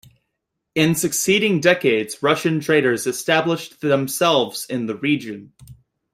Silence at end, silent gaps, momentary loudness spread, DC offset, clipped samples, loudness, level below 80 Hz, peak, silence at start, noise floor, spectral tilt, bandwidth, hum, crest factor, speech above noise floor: 0.4 s; none; 8 LU; under 0.1%; under 0.1%; -19 LUFS; -60 dBFS; -2 dBFS; 0.75 s; -78 dBFS; -4 dB/octave; 16 kHz; none; 18 dB; 59 dB